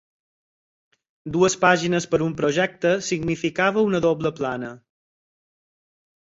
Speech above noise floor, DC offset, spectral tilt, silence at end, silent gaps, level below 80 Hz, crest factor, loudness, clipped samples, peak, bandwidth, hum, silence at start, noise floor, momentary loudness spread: over 69 dB; under 0.1%; -5 dB/octave; 1.55 s; none; -56 dBFS; 22 dB; -21 LUFS; under 0.1%; -2 dBFS; 8 kHz; none; 1.25 s; under -90 dBFS; 10 LU